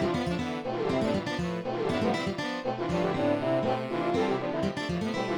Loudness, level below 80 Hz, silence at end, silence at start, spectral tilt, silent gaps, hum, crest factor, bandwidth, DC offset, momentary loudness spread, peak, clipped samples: -29 LUFS; -54 dBFS; 0 s; 0 s; -6.5 dB/octave; none; none; 16 dB; 18 kHz; 0.1%; 4 LU; -14 dBFS; under 0.1%